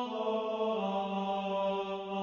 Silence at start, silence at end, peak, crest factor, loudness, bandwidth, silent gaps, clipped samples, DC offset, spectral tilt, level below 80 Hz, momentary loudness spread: 0 s; 0 s; -22 dBFS; 12 dB; -34 LUFS; 7.2 kHz; none; under 0.1%; under 0.1%; -7 dB/octave; -74 dBFS; 2 LU